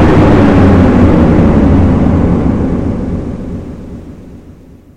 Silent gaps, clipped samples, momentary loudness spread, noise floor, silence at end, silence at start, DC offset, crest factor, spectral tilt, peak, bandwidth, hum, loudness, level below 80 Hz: none; 1%; 18 LU; -35 dBFS; 0 s; 0 s; 5%; 8 dB; -9 dB/octave; 0 dBFS; 8.6 kHz; none; -8 LUFS; -18 dBFS